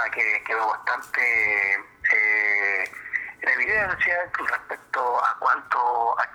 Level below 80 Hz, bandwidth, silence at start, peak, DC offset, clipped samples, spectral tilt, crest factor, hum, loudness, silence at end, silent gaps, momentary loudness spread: -60 dBFS; over 20 kHz; 0 s; -8 dBFS; under 0.1%; under 0.1%; -3 dB/octave; 16 dB; none; -22 LUFS; 0 s; none; 8 LU